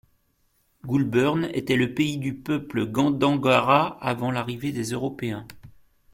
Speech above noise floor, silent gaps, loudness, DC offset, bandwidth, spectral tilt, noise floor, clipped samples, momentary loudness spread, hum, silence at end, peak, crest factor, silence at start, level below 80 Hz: 44 dB; none; -24 LUFS; under 0.1%; 16.5 kHz; -6 dB/octave; -68 dBFS; under 0.1%; 10 LU; none; 0.45 s; -4 dBFS; 22 dB; 0.85 s; -56 dBFS